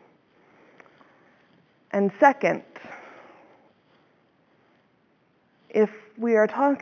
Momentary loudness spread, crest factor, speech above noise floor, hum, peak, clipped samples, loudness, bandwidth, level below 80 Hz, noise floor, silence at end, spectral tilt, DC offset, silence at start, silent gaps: 24 LU; 22 dB; 43 dB; none; -4 dBFS; under 0.1%; -23 LUFS; 7 kHz; -86 dBFS; -65 dBFS; 0 s; -7 dB/octave; under 0.1%; 1.95 s; none